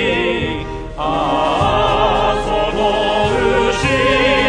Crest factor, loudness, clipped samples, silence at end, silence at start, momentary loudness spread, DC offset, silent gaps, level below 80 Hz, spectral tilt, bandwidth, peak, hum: 14 dB; -15 LUFS; under 0.1%; 0 s; 0 s; 7 LU; under 0.1%; none; -30 dBFS; -5 dB/octave; 10 kHz; 0 dBFS; none